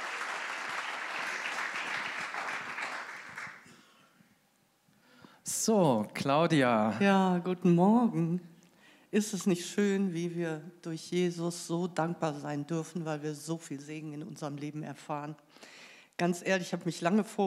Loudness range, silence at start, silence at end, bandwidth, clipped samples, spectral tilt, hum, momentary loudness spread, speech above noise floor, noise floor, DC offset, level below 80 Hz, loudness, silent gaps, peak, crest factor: 11 LU; 0 s; 0 s; 15.5 kHz; under 0.1%; -5.5 dB/octave; none; 16 LU; 40 dB; -70 dBFS; under 0.1%; -86 dBFS; -32 LUFS; none; -14 dBFS; 18 dB